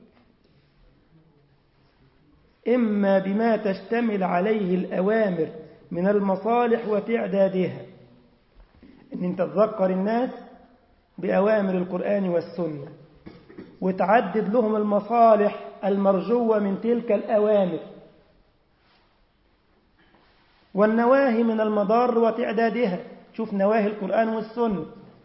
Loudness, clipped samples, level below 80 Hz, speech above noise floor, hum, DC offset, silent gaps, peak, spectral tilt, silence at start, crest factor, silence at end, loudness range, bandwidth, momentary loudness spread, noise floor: -23 LUFS; under 0.1%; -64 dBFS; 41 dB; none; under 0.1%; none; -6 dBFS; -11.5 dB/octave; 2.65 s; 18 dB; 0.25 s; 6 LU; 5.8 kHz; 11 LU; -63 dBFS